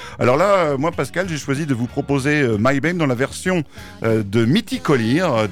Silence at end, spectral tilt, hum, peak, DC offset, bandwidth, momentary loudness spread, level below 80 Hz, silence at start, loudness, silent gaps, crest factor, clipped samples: 0 s; -6 dB/octave; none; -6 dBFS; under 0.1%; 16 kHz; 6 LU; -46 dBFS; 0 s; -19 LUFS; none; 12 dB; under 0.1%